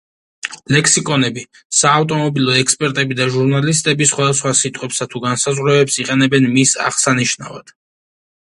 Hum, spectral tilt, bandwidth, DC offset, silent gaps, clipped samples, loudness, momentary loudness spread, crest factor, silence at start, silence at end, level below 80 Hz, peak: none; -3.5 dB/octave; 11.5 kHz; under 0.1%; 1.65-1.70 s; under 0.1%; -14 LUFS; 9 LU; 16 dB; 0.45 s; 0.95 s; -56 dBFS; 0 dBFS